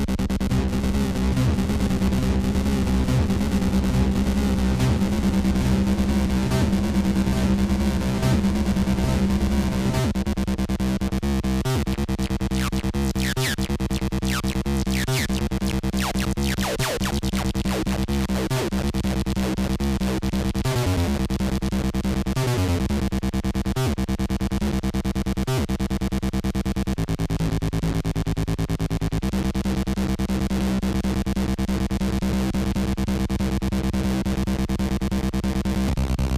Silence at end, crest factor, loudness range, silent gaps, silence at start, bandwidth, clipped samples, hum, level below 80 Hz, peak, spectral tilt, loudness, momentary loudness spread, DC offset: 0 s; 12 dB; 3 LU; none; 0 s; 15.5 kHz; under 0.1%; none; -28 dBFS; -10 dBFS; -6 dB/octave; -24 LUFS; 4 LU; under 0.1%